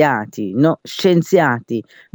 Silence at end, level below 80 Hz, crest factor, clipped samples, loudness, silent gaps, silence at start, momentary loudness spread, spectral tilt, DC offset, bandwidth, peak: 0.35 s; -62 dBFS; 16 dB; under 0.1%; -17 LUFS; none; 0 s; 10 LU; -6.5 dB/octave; under 0.1%; over 20 kHz; -2 dBFS